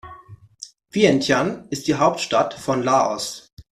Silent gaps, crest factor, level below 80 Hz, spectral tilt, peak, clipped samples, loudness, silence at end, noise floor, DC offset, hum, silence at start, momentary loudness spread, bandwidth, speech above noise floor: 3.53-3.57 s; 20 dB; -56 dBFS; -4.5 dB/octave; -2 dBFS; under 0.1%; -20 LUFS; 0.1 s; -45 dBFS; under 0.1%; none; 0.05 s; 20 LU; 14.5 kHz; 25 dB